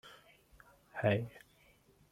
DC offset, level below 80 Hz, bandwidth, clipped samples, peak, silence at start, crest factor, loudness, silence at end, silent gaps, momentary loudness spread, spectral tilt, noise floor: under 0.1%; -70 dBFS; 15.5 kHz; under 0.1%; -18 dBFS; 0.05 s; 24 dB; -36 LUFS; 0.75 s; none; 26 LU; -7.5 dB/octave; -67 dBFS